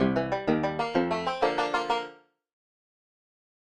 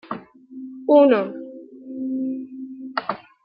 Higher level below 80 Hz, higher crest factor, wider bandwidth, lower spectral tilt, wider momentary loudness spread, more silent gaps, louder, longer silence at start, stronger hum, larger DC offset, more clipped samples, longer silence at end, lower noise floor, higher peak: first, -58 dBFS vs -76 dBFS; about the same, 18 dB vs 20 dB; first, 11 kHz vs 5.4 kHz; second, -6 dB/octave vs -9.5 dB/octave; second, 4 LU vs 24 LU; neither; second, -28 LUFS vs -21 LUFS; about the same, 0 s vs 0.1 s; neither; neither; neither; first, 1.65 s vs 0.25 s; first, -47 dBFS vs -39 dBFS; second, -12 dBFS vs -4 dBFS